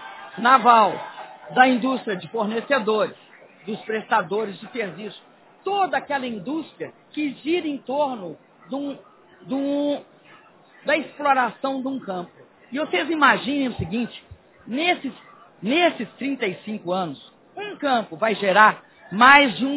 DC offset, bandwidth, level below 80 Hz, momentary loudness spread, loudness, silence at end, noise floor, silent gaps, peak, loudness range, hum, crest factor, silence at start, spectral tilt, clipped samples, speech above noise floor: under 0.1%; 4 kHz; -60 dBFS; 19 LU; -21 LUFS; 0 s; -51 dBFS; none; 0 dBFS; 8 LU; none; 22 dB; 0 s; -8 dB/octave; under 0.1%; 29 dB